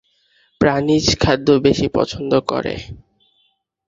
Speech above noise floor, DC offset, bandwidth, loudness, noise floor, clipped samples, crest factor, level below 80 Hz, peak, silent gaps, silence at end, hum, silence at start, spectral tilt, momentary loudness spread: 48 dB; under 0.1%; 7.8 kHz; -17 LUFS; -64 dBFS; under 0.1%; 18 dB; -38 dBFS; 0 dBFS; none; 0.9 s; none; 0.6 s; -5 dB/octave; 10 LU